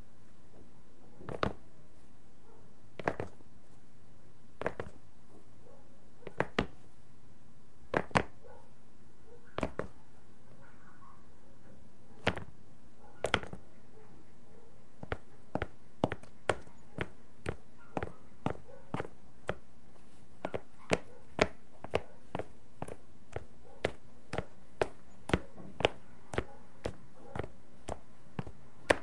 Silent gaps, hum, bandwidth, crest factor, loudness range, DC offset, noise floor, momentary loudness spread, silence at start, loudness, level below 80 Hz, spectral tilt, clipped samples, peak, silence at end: none; none; 11.5 kHz; 34 dB; 6 LU; 1%; -62 dBFS; 26 LU; 0.55 s; -39 LUFS; -56 dBFS; -5 dB/octave; under 0.1%; -6 dBFS; 0 s